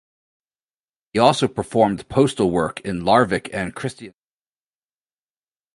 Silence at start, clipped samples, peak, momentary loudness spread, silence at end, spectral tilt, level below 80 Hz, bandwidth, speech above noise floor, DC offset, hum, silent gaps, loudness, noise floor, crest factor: 1.15 s; under 0.1%; 0 dBFS; 11 LU; 1.65 s; -5.5 dB/octave; -50 dBFS; 11.5 kHz; over 71 dB; under 0.1%; none; none; -20 LUFS; under -90 dBFS; 22 dB